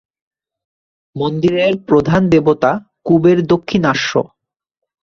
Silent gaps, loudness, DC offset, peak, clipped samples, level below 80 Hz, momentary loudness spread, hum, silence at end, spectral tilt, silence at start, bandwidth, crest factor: none; -14 LUFS; under 0.1%; -2 dBFS; under 0.1%; -46 dBFS; 9 LU; none; 0.75 s; -6.5 dB/octave; 1.15 s; 7.2 kHz; 14 dB